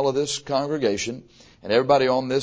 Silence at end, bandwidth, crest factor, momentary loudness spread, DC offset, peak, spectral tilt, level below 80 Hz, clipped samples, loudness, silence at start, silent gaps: 0 s; 8 kHz; 18 dB; 13 LU; under 0.1%; -4 dBFS; -4 dB/octave; -58 dBFS; under 0.1%; -22 LUFS; 0 s; none